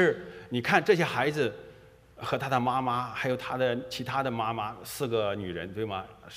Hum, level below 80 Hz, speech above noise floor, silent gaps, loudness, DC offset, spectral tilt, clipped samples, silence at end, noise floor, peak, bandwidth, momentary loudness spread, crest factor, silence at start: none; -62 dBFS; 25 dB; none; -29 LUFS; under 0.1%; -5.5 dB/octave; under 0.1%; 0 s; -53 dBFS; -8 dBFS; 15.5 kHz; 10 LU; 22 dB; 0 s